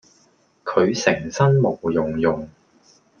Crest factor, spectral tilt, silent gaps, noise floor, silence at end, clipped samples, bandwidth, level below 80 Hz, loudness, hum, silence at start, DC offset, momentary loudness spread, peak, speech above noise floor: 20 dB; -6 dB/octave; none; -59 dBFS; 0.7 s; under 0.1%; 7.2 kHz; -54 dBFS; -20 LUFS; none; 0.65 s; under 0.1%; 12 LU; -2 dBFS; 40 dB